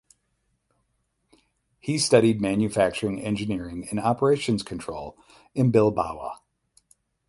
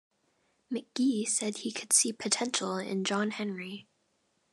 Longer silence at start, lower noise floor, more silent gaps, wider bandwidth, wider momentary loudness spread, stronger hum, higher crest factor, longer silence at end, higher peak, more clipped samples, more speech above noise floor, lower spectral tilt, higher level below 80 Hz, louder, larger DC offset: first, 1.85 s vs 0.7 s; about the same, -73 dBFS vs -75 dBFS; neither; about the same, 11.5 kHz vs 12.5 kHz; first, 17 LU vs 14 LU; neither; about the same, 22 dB vs 22 dB; first, 0.95 s vs 0.7 s; first, -4 dBFS vs -10 dBFS; neither; first, 50 dB vs 43 dB; first, -5.5 dB/octave vs -2.5 dB/octave; first, -54 dBFS vs -86 dBFS; first, -24 LUFS vs -30 LUFS; neither